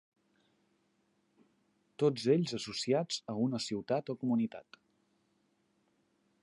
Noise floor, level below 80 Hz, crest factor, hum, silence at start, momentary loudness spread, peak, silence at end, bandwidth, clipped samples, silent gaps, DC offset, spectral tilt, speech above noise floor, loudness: -76 dBFS; -78 dBFS; 20 dB; none; 2 s; 7 LU; -16 dBFS; 1.8 s; 11.5 kHz; under 0.1%; none; under 0.1%; -5.5 dB/octave; 42 dB; -34 LUFS